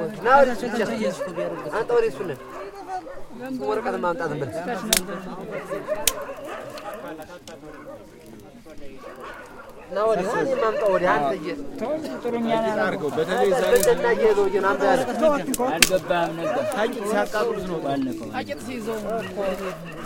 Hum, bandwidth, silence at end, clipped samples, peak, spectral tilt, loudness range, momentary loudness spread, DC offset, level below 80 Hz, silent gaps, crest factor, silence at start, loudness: none; 17 kHz; 0 s; under 0.1%; 0 dBFS; -3.5 dB/octave; 10 LU; 20 LU; under 0.1%; -48 dBFS; none; 24 dB; 0 s; -23 LUFS